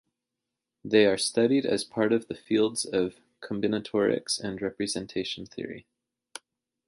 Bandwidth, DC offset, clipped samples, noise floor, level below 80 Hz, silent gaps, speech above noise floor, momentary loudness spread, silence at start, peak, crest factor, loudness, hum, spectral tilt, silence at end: 11.5 kHz; under 0.1%; under 0.1%; -86 dBFS; -64 dBFS; none; 60 dB; 22 LU; 0.85 s; -8 dBFS; 20 dB; -27 LUFS; none; -4 dB/octave; 1.05 s